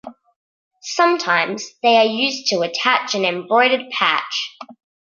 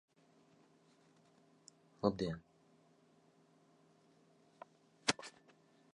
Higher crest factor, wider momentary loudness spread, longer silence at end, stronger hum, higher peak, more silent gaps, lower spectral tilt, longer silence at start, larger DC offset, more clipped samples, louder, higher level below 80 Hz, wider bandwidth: second, 18 dB vs 34 dB; second, 10 LU vs 26 LU; second, 0.3 s vs 0.65 s; neither; first, 0 dBFS vs -14 dBFS; first, 0.36-0.71 s vs none; second, -2.5 dB/octave vs -4 dB/octave; second, 0.05 s vs 2 s; neither; neither; first, -17 LUFS vs -40 LUFS; about the same, -74 dBFS vs -72 dBFS; second, 7.4 kHz vs 10.5 kHz